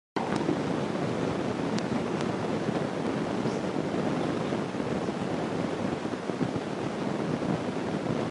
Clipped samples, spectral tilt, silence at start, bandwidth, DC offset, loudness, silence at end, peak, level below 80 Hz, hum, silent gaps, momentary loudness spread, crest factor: under 0.1%; -6.5 dB/octave; 0.15 s; 11.5 kHz; under 0.1%; -30 LUFS; 0 s; -14 dBFS; -56 dBFS; none; none; 2 LU; 16 dB